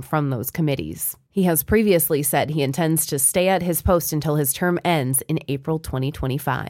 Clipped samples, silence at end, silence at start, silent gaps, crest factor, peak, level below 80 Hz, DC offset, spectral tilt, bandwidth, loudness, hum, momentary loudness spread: under 0.1%; 0 s; 0 s; none; 14 dB; -6 dBFS; -42 dBFS; under 0.1%; -5 dB/octave; 17 kHz; -21 LUFS; none; 8 LU